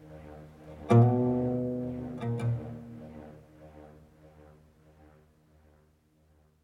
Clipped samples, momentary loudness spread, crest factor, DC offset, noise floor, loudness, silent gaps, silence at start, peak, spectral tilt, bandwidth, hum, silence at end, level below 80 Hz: under 0.1%; 27 LU; 22 dB; under 0.1%; -66 dBFS; -28 LUFS; none; 0 s; -10 dBFS; -10 dB/octave; 6 kHz; none; 2.75 s; -58 dBFS